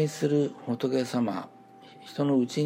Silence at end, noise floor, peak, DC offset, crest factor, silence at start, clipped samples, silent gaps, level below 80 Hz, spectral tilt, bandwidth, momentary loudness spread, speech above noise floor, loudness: 0 s; -51 dBFS; -14 dBFS; under 0.1%; 14 dB; 0 s; under 0.1%; none; -80 dBFS; -6.5 dB/octave; 16 kHz; 14 LU; 23 dB; -28 LUFS